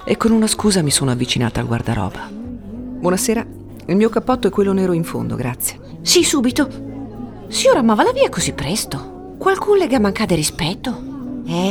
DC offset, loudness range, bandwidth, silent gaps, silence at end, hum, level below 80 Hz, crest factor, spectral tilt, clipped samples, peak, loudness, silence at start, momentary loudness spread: under 0.1%; 3 LU; 18 kHz; none; 0 s; none; -40 dBFS; 16 dB; -4.5 dB/octave; under 0.1%; -2 dBFS; -17 LUFS; 0 s; 16 LU